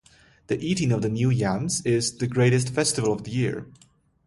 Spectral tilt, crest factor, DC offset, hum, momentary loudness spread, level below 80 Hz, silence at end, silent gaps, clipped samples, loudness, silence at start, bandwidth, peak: -5 dB/octave; 16 dB; under 0.1%; none; 7 LU; -54 dBFS; 0.55 s; none; under 0.1%; -24 LUFS; 0.5 s; 11.5 kHz; -8 dBFS